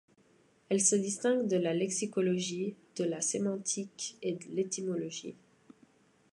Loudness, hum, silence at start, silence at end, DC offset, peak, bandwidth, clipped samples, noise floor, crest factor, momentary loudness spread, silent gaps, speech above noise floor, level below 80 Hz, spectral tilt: -32 LUFS; none; 0.7 s; 1 s; under 0.1%; -14 dBFS; 11.5 kHz; under 0.1%; -66 dBFS; 20 dB; 11 LU; none; 34 dB; -80 dBFS; -4 dB/octave